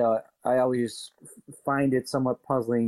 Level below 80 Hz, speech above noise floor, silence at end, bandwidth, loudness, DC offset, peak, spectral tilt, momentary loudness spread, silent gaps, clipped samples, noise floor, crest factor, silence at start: -68 dBFS; 23 dB; 0 s; 13 kHz; -27 LUFS; under 0.1%; -12 dBFS; -6.5 dB/octave; 14 LU; none; under 0.1%; -49 dBFS; 14 dB; 0 s